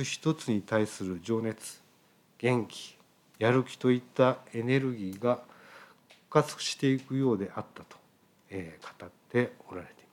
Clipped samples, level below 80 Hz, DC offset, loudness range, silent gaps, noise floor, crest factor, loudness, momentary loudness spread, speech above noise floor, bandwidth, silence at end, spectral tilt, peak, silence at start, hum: under 0.1%; -78 dBFS; under 0.1%; 4 LU; none; -64 dBFS; 22 dB; -30 LUFS; 18 LU; 34 dB; 16 kHz; 0.25 s; -5.5 dB/octave; -10 dBFS; 0 s; none